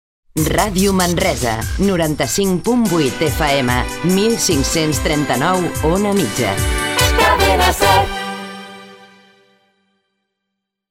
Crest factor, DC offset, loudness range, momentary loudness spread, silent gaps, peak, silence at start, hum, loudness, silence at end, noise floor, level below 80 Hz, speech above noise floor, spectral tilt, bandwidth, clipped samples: 16 dB; under 0.1%; 2 LU; 7 LU; none; -2 dBFS; 0.35 s; none; -15 LUFS; 1.95 s; -77 dBFS; -28 dBFS; 62 dB; -4 dB/octave; 16.5 kHz; under 0.1%